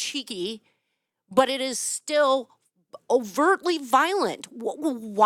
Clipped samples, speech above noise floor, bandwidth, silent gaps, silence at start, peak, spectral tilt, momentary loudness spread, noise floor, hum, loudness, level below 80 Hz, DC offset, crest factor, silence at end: under 0.1%; 55 dB; 17 kHz; none; 0 s; -6 dBFS; -2.5 dB/octave; 10 LU; -79 dBFS; none; -24 LUFS; -76 dBFS; under 0.1%; 20 dB; 0 s